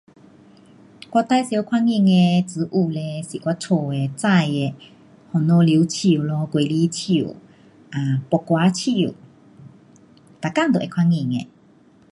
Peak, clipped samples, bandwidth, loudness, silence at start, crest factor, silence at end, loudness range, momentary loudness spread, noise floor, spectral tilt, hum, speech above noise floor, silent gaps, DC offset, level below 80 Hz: -4 dBFS; under 0.1%; 11.5 kHz; -20 LUFS; 1.1 s; 16 dB; 0.65 s; 4 LU; 10 LU; -52 dBFS; -6.5 dB/octave; none; 33 dB; none; under 0.1%; -62 dBFS